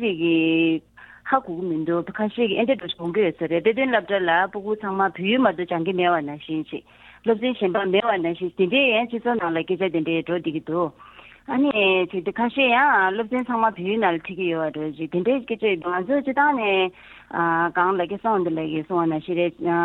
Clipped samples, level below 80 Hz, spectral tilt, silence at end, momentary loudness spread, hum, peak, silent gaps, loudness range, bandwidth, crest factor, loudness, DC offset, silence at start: under 0.1%; -62 dBFS; -8 dB/octave; 0 s; 8 LU; none; -4 dBFS; none; 2 LU; 4.1 kHz; 18 dB; -22 LUFS; under 0.1%; 0 s